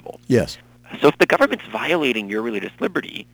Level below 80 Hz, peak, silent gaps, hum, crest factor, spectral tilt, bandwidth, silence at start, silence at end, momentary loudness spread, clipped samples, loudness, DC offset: -52 dBFS; -2 dBFS; none; none; 18 dB; -5.5 dB/octave; over 20 kHz; 0.05 s; 0.1 s; 11 LU; under 0.1%; -20 LUFS; under 0.1%